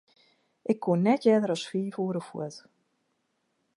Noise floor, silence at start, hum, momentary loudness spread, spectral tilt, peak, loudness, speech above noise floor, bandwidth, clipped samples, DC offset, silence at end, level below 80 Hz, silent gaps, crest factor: -76 dBFS; 0.7 s; none; 15 LU; -7 dB/octave; -10 dBFS; -28 LUFS; 49 dB; 11 kHz; under 0.1%; under 0.1%; 1.15 s; -80 dBFS; none; 20 dB